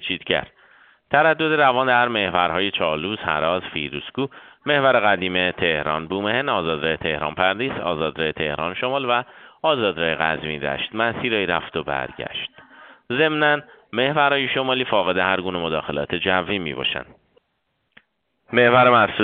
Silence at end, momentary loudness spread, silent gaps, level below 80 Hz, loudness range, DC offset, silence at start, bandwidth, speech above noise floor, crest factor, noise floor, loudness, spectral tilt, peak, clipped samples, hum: 0 s; 10 LU; none; -54 dBFS; 3 LU; under 0.1%; 0 s; 4.7 kHz; 51 dB; 20 dB; -72 dBFS; -21 LUFS; -2 dB/octave; 0 dBFS; under 0.1%; none